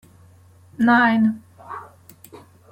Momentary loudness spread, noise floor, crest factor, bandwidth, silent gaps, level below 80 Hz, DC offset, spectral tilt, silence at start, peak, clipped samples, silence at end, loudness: 22 LU; -50 dBFS; 18 dB; 16.5 kHz; none; -64 dBFS; under 0.1%; -6.5 dB/octave; 0.8 s; -6 dBFS; under 0.1%; 0.85 s; -18 LUFS